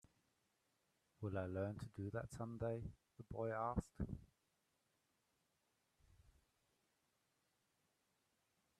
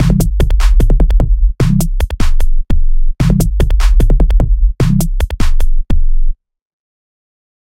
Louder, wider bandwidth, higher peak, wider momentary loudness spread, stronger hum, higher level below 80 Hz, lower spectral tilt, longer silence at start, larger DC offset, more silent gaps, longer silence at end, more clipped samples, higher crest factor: second, -47 LUFS vs -15 LUFS; second, 13 kHz vs 15.5 kHz; second, -28 dBFS vs 0 dBFS; first, 10 LU vs 6 LU; neither; second, -66 dBFS vs -10 dBFS; first, -8 dB/octave vs -6.5 dB/octave; first, 1.2 s vs 0 s; neither; neither; first, 4.55 s vs 1.35 s; neither; first, 24 dB vs 10 dB